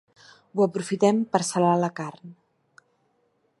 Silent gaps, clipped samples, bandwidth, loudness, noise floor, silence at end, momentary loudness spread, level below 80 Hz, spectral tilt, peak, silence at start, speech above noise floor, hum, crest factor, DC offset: none; under 0.1%; 11.5 kHz; -24 LUFS; -69 dBFS; 1.3 s; 12 LU; -74 dBFS; -5.5 dB/octave; -4 dBFS; 0.55 s; 46 dB; none; 22 dB; under 0.1%